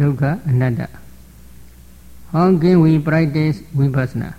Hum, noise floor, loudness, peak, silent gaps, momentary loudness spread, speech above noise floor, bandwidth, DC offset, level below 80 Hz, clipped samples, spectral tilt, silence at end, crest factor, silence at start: none; -42 dBFS; -16 LUFS; -4 dBFS; none; 9 LU; 27 dB; 14 kHz; 0.6%; -42 dBFS; under 0.1%; -9 dB/octave; 0.05 s; 14 dB; 0 s